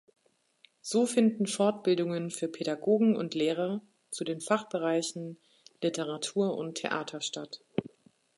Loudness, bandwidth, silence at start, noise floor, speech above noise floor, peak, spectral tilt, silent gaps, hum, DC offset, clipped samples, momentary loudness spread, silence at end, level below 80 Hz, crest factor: -31 LUFS; 11.5 kHz; 0.85 s; -65 dBFS; 36 dB; -12 dBFS; -4.5 dB/octave; none; none; under 0.1%; under 0.1%; 11 LU; 0.5 s; -80 dBFS; 18 dB